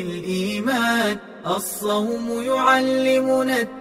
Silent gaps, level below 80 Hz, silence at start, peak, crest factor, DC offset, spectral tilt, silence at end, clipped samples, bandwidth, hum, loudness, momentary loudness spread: none; -58 dBFS; 0 s; -4 dBFS; 18 dB; under 0.1%; -4 dB/octave; 0 s; under 0.1%; 16 kHz; none; -21 LUFS; 8 LU